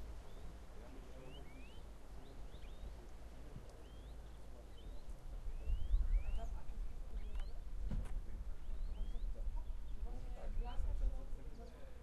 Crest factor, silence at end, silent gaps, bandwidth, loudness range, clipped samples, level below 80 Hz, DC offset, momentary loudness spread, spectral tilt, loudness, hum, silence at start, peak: 18 dB; 0 s; none; 10.5 kHz; 10 LU; under 0.1%; -44 dBFS; under 0.1%; 13 LU; -6.5 dB/octave; -50 LUFS; none; 0 s; -24 dBFS